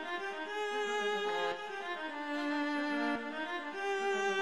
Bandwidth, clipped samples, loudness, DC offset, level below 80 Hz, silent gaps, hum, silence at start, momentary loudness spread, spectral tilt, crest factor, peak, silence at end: 12.5 kHz; under 0.1%; -36 LUFS; 0.1%; -80 dBFS; none; none; 0 s; 5 LU; -3 dB/octave; 14 dB; -22 dBFS; 0 s